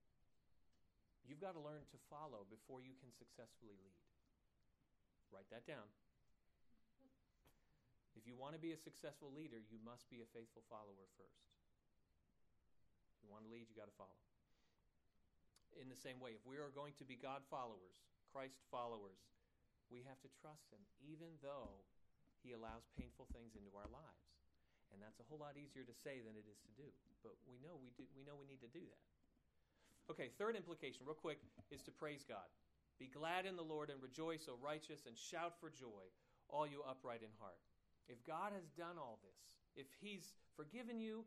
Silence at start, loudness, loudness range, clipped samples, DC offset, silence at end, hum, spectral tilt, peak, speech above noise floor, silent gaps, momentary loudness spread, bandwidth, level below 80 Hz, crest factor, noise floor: 0.5 s; -55 LUFS; 14 LU; under 0.1%; under 0.1%; 0 s; none; -5 dB/octave; -30 dBFS; 28 dB; none; 16 LU; 13 kHz; -78 dBFS; 26 dB; -83 dBFS